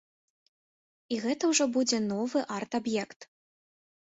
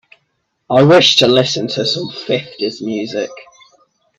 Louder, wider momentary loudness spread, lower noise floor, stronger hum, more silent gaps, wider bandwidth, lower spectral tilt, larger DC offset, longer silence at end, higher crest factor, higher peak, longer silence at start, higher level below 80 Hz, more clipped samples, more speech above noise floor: second, -29 LUFS vs -13 LUFS; second, 8 LU vs 14 LU; first, under -90 dBFS vs -67 dBFS; neither; first, 3.16-3.20 s vs none; second, 8.4 kHz vs 12.5 kHz; second, -3 dB/octave vs -4.5 dB/octave; neither; first, 0.9 s vs 0.75 s; about the same, 20 dB vs 16 dB; second, -12 dBFS vs 0 dBFS; first, 1.1 s vs 0.7 s; second, -74 dBFS vs -56 dBFS; neither; first, over 61 dB vs 54 dB